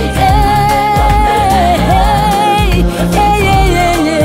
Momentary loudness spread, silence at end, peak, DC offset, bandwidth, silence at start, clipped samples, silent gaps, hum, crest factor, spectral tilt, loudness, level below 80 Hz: 2 LU; 0 s; 0 dBFS; under 0.1%; 16.5 kHz; 0 s; under 0.1%; none; none; 8 dB; -5.5 dB/octave; -10 LUFS; -16 dBFS